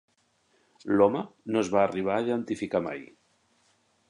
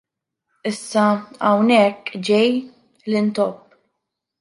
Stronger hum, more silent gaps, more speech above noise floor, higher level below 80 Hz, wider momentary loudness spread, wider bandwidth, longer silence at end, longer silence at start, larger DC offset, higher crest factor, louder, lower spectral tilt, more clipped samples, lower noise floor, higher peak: neither; neither; second, 42 dB vs 61 dB; about the same, -66 dBFS vs -68 dBFS; about the same, 12 LU vs 12 LU; about the same, 10.5 kHz vs 11.5 kHz; first, 1.05 s vs 0.85 s; first, 0.85 s vs 0.65 s; neither; about the same, 20 dB vs 16 dB; second, -27 LUFS vs -19 LUFS; about the same, -6.5 dB/octave vs -5.5 dB/octave; neither; second, -69 dBFS vs -79 dBFS; second, -8 dBFS vs -4 dBFS